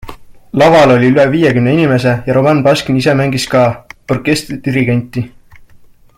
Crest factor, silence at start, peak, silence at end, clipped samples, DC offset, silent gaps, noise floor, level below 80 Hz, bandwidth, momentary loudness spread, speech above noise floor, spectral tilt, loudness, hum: 12 dB; 0.05 s; 0 dBFS; 0.9 s; under 0.1%; under 0.1%; none; -41 dBFS; -42 dBFS; 16 kHz; 12 LU; 30 dB; -6.5 dB/octave; -11 LUFS; none